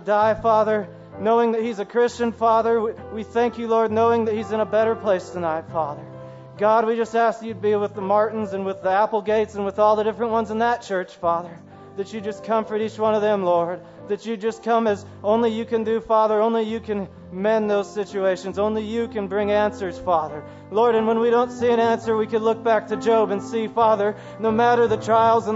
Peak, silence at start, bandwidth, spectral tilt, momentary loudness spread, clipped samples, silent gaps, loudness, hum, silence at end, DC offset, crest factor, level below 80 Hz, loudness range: -6 dBFS; 0 s; 8 kHz; -6 dB/octave; 9 LU; under 0.1%; none; -21 LUFS; none; 0 s; under 0.1%; 16 dB; -56 dBFS; 3 LU